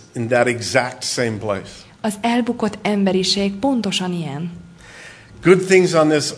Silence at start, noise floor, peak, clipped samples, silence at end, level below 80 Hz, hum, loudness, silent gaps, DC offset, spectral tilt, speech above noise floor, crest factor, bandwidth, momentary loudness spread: 0.15 s; -40 dBFS; 0 dBFS; under 0.1%; 0 s; -54 dBFS; none; -18 LUFS; none; under 0.1%; -4.5 dB/octave; 22 dB; 18 dB; 11 kHz; 14 LU